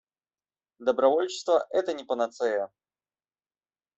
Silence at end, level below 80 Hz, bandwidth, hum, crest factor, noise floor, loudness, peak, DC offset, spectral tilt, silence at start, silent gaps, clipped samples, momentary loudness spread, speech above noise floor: 1.3 s; -76 dBFS; 8.2 kHz; none; 20 dB; under -90 dBFS; -27 LUFS; -8 dBFS; under 0.1%; -3 dB/octave; 0.8 s; none; under 0.1%; 8 LU; over 64 dB